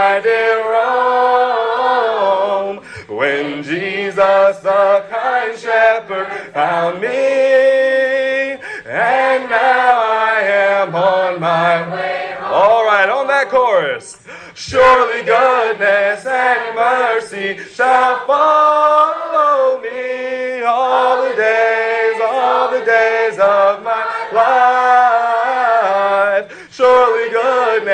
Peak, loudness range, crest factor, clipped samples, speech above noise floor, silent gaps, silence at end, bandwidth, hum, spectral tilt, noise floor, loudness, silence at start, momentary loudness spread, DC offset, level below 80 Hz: 0 dBFS; 2 LU; 12 dB; under 0.1%; 21 dB; none; 0 s; 9.6 kHz; none; -4 dB/octave; -35 dBFS; -14 LUFS; 0 s; 9 LU; under 0.1%; -56 dBFS